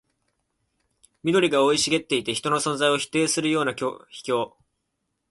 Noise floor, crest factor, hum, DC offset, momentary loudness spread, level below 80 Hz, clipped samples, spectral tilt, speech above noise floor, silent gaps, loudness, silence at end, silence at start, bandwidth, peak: -78 dBFS; 18 dB; none; under 0.1%; 11 LU; -64 dBFS; under 0.1%; -3.5 dB/octave; 54 dB; none; -23 LUFS; 0.85 s; 1.25 s; 12 kHz; -8 dBFS